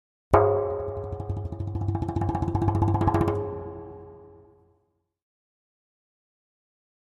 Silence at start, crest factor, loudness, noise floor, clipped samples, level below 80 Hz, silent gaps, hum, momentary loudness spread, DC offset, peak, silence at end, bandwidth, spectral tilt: 0.3 s; 26 dB; -26 LUFS; -72 dBFS; under 0.1%; -42 dBFS; none; none; 18 LU; under 0.1%; -2 dBFS; 2.7 s; 7.4 kHz; -9.5 dB/octave